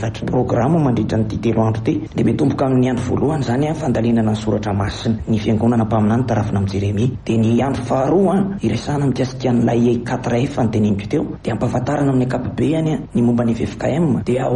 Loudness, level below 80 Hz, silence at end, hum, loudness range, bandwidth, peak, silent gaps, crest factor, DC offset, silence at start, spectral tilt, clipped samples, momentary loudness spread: -18 LUFS; -40 dBFS; 0 s; none; 1 LU; 10.5 kHz; -4 dBFS; none; 12 dB; under 0.1%; 0 s; -8 dB/octave; under 0.1%; 4 LU